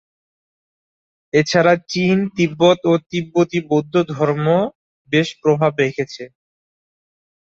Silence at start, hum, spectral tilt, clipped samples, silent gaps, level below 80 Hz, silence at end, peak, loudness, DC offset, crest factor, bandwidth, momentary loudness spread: 1.35 s; none; -6 dB/octave; under 0.1%; 4.75-5.05 s; -58 dBFS; 1.2 s; -2 dBFS; -17 LUFS; under 0.1%; 18 dB; 7.8 kHz; 7 LU